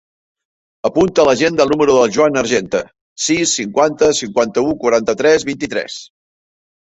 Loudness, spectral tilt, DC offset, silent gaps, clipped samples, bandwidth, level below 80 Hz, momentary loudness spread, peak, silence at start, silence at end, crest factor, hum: -15 LUFS; -3.5 dB/octave; under 0.1%; 3.01-3.16 s; under 0.1%; 8.2 kHz; -50 dBFS; 10 LU; -2 dBFS; 0.85 s; 0.8 s; 14 dB; none